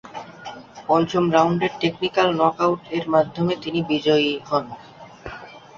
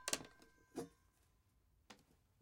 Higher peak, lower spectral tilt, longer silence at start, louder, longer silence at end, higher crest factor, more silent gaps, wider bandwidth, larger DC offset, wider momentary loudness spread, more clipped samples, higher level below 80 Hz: first, -2 dBFS vs -16 dBFS; first, -6 dB/octave vs -1.5 dB/octave; about the same, 0.05 s vs 0 s; first, -21 LUFS vs -49 LUFS; second, 0.2 s vs 0.45 s; second, 20 dB vs 38 dB; neither; second, 7.4 kHz vs 16 kHz; neither; about the same, 19 LU vs 21 LU; neither; first, -56 dBFS vs -78 dBFS